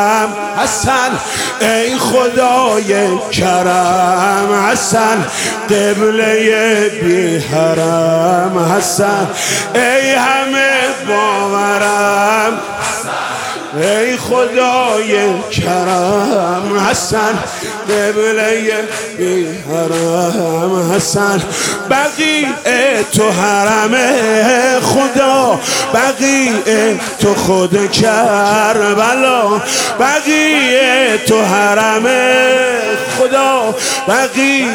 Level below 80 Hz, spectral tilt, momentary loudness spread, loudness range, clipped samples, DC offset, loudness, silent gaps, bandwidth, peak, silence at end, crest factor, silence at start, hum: -48 dBFS; -3.5 dB/octave; 5 LU; 4 LU; under 0.1%; under 0.1%; -12 LUFS; none; 17.5 kHz; 0 dBFS; 0 s; 12 dB; 0 s; none